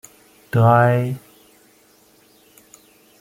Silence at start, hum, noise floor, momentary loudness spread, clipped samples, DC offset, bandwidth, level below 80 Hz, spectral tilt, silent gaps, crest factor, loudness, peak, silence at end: 0.55 s; none; -54 dBFS; 14 LU; under 0.1%; under 0.1%; 15.5 kHz; -60 dBFS; -8 dB/octave; none; 20 dB; -17 LUFS; -2 dBFS; 2.05 s